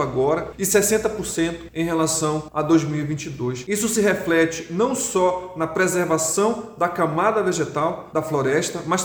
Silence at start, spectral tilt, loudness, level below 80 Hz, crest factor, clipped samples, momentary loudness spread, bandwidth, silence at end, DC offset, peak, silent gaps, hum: 0 s; -4.5 dB/octave; -21 LUFS; -50 dBFS; 18 dB; under 0.1%; 6 LU; over 20 kHz; 0 s; under 0.1%; -4 dBFS; none; none